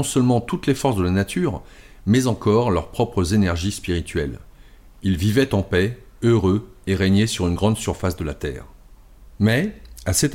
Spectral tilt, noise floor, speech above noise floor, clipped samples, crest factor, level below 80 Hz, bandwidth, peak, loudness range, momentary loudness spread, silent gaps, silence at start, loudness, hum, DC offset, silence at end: -5.5 dB/octave; -46 dBFS; 26 dB; under 0.1%; 14 dB; -38 dBFS; 16.5 kHz; -6 dBFS; 2 LU; 10 LU; none; 0 s; -21 LUFS; none; under 0.1%; 0 s